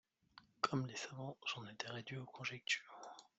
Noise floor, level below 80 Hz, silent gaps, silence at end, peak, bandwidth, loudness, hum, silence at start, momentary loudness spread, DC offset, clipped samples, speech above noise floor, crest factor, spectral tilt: -68 dBFS; -84 dBFS; none; 0.15 s; -20 dBFS; 8.2 kHz; -44 LUFS; none; 0.35 s; 9 LU; under 0.1%; under 0.1%; 22 dB; 26 dB; -4 dB/octave